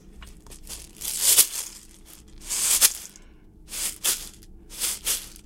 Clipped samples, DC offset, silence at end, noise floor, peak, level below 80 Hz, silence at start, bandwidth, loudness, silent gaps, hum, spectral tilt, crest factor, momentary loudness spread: under 0.1%; under 0.1%; 0.05 s; -49 dBFS; 0 dBFS; -48 dBFS; 0.05 s; 17 kHz; -22 LUFS; none; none; 1.5 dB/octave; 28 dB; 22 LU